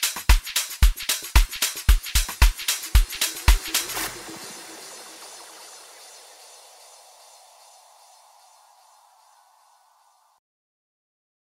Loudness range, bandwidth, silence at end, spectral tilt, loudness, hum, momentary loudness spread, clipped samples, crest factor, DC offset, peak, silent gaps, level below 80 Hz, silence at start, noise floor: 23 LU; 16.5 kHz; 5.8 s; -2 dB/octave; -23 LUFS; none; 23 LU; under 0.1%; 24 dB; under 0.1%; -2 dBFS; none; -26 dBFS; 0 s; -61 dBFS